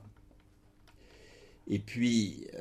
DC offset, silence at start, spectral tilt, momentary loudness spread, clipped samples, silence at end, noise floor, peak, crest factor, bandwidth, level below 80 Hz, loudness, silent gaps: under 0.1%; 0 s; -5 dB/octave; 10 LU; under 0.1%; 0 s; -62 dBFS; -16 dBFS; 20 dB; 12 kHz; -64 dBFS; -32 LUFS; none